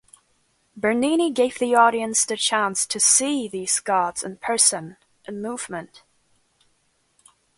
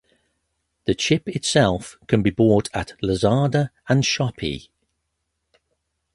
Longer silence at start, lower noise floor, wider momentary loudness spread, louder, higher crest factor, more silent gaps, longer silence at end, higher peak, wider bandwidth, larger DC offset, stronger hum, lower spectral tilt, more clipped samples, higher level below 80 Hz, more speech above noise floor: about the same, 0.75 s vs 0.85 s; second, -67 dBFS vs -76 dBFS; first, 16 LU vs 11 LU; about the same, -20 LUFS vs -21 LUFS; about the same, 22 dB vs 20 dB; neither; first, 1.75 s vs 1.55 s; about the same, -2 dBFS vs -2 dBFS; about the same, 12 kHz vs 11.5 kHz; neither; neither; second, -1.5 dB/octave vs -5.5 dB/octave; neither; second, -66 dBFS vs -46 dBFS; second, 45 dB vs 56 dB